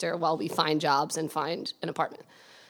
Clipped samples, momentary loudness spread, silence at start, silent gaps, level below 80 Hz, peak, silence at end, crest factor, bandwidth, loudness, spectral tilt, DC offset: under 0.1%; 8 LU; 0 s; none; -84 dBFS; -8 dBFS; 0.1 s; 20 dB; 19 kHz; -29 LUFS; -4 dB/octave; under 0.1%